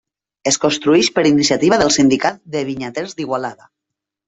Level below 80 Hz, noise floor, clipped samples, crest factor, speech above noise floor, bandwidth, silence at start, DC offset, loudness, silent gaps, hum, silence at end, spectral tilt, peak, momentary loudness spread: -54 dBFS; -82 dBFS; under 0.1%; 16 dB; 66 dB; 8.4 kHz; 0.45 s; under 0.1%; -16 LUFS; none; none; 0.75 s; -3.5 dB/octave; 0 dBFS; 11 LU